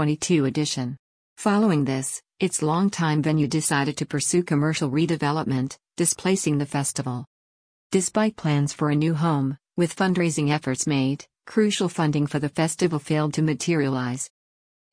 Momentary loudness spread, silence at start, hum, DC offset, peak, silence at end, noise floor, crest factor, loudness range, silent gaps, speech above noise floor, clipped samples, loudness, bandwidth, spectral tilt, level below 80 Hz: 6 LU; 0 s; none; under 0.1%; -8 dBFS; 0.65 s; under -90 dBFS; 16 dB; 2 LU; 0.99-1.36 s, 7.27-7.90 s; over 67 dB; under 0.1%; -24 LUFS; 10.5 kHz; -5 dB/octave; -62 dBFS